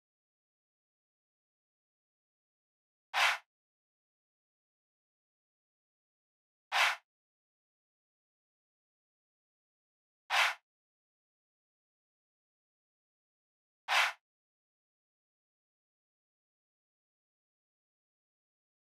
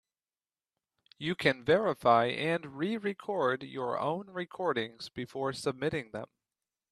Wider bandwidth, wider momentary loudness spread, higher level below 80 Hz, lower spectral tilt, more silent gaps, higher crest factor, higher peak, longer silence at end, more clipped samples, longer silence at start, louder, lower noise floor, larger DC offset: about the same, 14.5 kHz vs 13.5 kHz; about the same, 12 LU vs 13 LU; second, under -90 dBFS vs -70 dBFS; second, 5.5 dB/octave vs -5.5 dB/octave; first, 3.46-6.71 s, 7.04-10.29 s, 10.63-13.88 s vs none; about the same, 26 dB vs 24 dB; second, -16 dBFS vs -10 dBFS; first, 4.8 s vs 0.65 s; neither; first, 3.15 s vs 1.2 s; about the same, -31 LUFS vs -32 LUFS; about the same, under -90 dBFS vs under -90 dBFS; neither